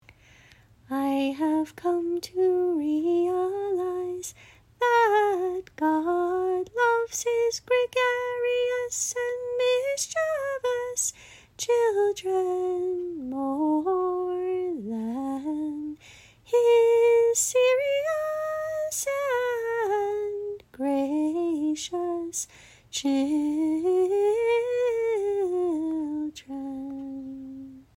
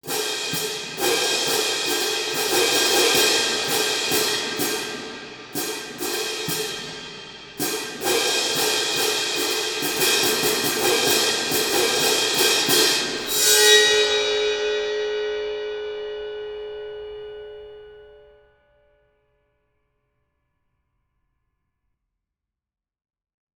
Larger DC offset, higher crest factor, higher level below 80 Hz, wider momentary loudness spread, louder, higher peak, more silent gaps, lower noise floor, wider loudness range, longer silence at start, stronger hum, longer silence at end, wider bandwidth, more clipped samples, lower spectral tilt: neither; second, 16 dB vs 22 dB; about the same, -64 dBFS vs -60 dBFS; second, 11 LU vs 17 LU; second, -26 LUFS vs -20 LUFS; second, -10 dBFS vs -2 dBFS; neither; second, -55 dBFS vs -86 dBFS; second, 5 LU vs 15 LU; first, 0.9 s vs 0.05 s; neither; second, 0.15 s vs 5.4 s; second, 16 kHz vs over 20 kHz; neither; first, -2.5 dB/octave vs -0.5 dB/octave